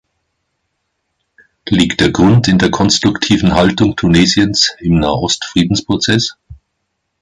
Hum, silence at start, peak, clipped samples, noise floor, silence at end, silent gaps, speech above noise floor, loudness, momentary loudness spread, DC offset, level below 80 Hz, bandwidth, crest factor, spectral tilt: none; 1.65 s; 0 dBFS; under 0.1%; -70 dBFS; 0.65 s; none; 59 dB; -12 LUFS; 5 LU; under 0.1%; -34 dBFS; 11.5 kHz; 14 dB; -4.5 dB/octave